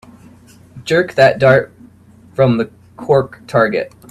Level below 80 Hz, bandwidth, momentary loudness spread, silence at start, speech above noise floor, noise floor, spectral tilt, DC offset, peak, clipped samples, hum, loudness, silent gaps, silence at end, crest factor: -50 dBFS; 13 kHz; 18 LU; 0.75 s; 31 dB; -44 dBFS; -6.5 dB/octave; under 0.1%; 0 dBFS; under 0.1%; none; -14 LUFS; none; 0.2 s; 16 dB